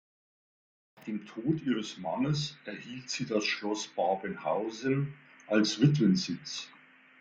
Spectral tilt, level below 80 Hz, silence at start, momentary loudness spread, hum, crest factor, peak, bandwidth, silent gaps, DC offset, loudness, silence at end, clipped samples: -5.5 dB/octave; -68 dBFS; 1 s; 14 LU; none; 20 dB; -12 dBFS; 9 kHz; none; under 0.1%; -31 LUFS; 0.5 s; under 0.1%